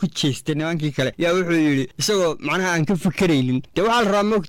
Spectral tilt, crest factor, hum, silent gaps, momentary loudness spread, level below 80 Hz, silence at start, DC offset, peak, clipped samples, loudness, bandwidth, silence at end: -5 dB/octave; 8 dB; none; none; 4 LU; -48 dBFS; 0 s; under 0.1%; -12 dBFS; under 0.1%; -20 LUFS; 16.5 kHz; 0 s